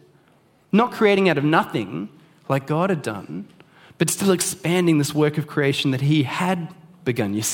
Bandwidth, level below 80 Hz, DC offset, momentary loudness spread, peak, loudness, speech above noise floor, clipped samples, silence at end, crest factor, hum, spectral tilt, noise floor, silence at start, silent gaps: 17.5 kHz; -66 dBFS; under 0.1%; 13 LU; -2 dBFS; -21 LUFS; 37 dB; under 0.1%; 0 s; 20 dB; none; -5 dB/octave; -57 dBFS; 0.75 s; none